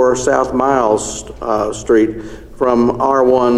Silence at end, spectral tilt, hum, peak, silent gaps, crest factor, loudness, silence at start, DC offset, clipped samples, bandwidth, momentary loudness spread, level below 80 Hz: 0 s; -5 dB/octave; none; 0 dBFS; none; 14 dB; -15 LUFS; 0 s; under 0.1%; under 0.1%; 12 kHz; 11 LU; -38 dBFS